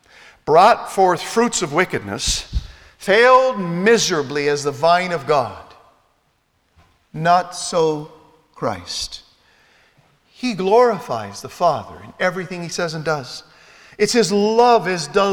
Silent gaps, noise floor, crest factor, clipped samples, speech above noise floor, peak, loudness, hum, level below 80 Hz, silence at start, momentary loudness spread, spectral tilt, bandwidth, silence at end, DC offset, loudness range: none; -64 dBFS; 18 dB; under 0.1%; 47 dB; 0 dBFS; -18 LUFS; none; -42 dBFS; 0.45 s; 15 LU; -3.5 dB/octave; 17.5 kHz; 0 s; under 0.1%; 6 LU